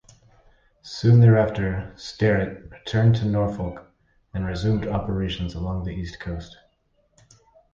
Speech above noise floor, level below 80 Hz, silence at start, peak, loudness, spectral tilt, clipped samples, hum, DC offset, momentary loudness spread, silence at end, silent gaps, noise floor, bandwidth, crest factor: 45 dB; -40 dBFS; 0.85 s; -6 dBFS; -23 LUFS; -8 dB/octave; under 0.1%; none; under 0.1%; 18 LU; 1.25 s; none; -66 dBFS; 7.2 kHz; 18 dB